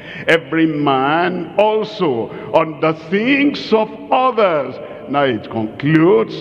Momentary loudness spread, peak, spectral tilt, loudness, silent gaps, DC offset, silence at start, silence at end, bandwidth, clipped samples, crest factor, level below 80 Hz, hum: 7 LU; 0 dBFS; -7 dB/octave; -16 LUFS; none; under 0.1%; 0 s; 0 s; 9.2 kHz; under 0.1%; 16 dB; -58 dBFS; none